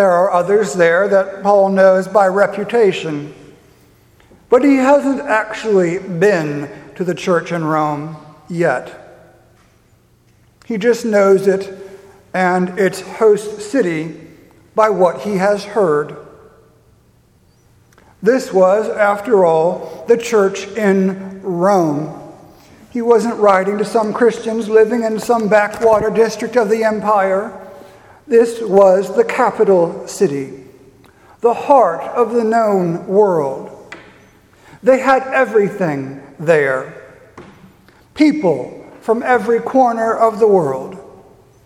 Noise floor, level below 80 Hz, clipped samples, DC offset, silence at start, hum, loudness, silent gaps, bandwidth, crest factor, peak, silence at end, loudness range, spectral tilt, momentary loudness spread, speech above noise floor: -52 dBFS; -56 dBFS; under 0.1%; under 0.1%; 0 s; none; -15 LUFS; none; 14.5 kHz; 16 dB; 0 dBFS; 0.6 s; 4 LU; -6 dB/octave; 13 LU; 39 dB